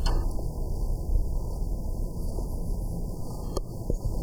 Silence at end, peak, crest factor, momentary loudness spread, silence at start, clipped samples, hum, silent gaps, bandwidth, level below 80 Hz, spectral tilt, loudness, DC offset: 0 s; -12 dBFS; 16 dB; 4 LU; 0 s; under 0.1%; none; none; 15 kHz; -28 dBFS; -6.5 dB/octave; -34 LUFS; under 0.1%